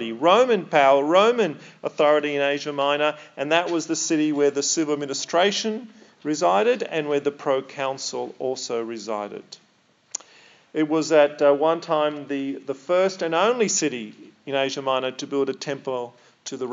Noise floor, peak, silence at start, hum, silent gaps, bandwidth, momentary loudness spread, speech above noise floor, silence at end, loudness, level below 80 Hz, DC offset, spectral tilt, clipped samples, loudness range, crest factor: -61 dBFS; -4 dBFS; 0 s; none; none; 7.8 kHz; 15 LU; 39 dB; 0 s; -22 LUFS; under -90 dBFS; under 0.1%; -3 dB/octave; under 0.1%; 6 LU; 20 dB